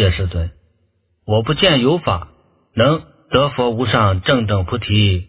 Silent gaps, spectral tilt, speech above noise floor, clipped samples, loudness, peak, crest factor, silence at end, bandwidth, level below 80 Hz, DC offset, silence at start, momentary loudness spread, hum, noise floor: none; -10.5 dB/octave; 47 dB; under 0.1%; -17 LUFS; 0 dBFS; 16 dB; 0.05 s; 4 kHz; -30 dBFS; under 0.1%; 0 s; 10 LU; none; -63 dBFS